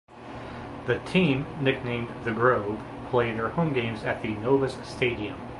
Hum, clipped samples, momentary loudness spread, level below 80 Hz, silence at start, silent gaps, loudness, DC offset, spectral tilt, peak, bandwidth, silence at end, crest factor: none; under 0.1%; 13 LU; -50 dBFS; 0.1 s; none; -27 LUFS; under 0.1%; -7 dB/octave; -8 dBFS; 11.5 kHz; 0 s; 20 dB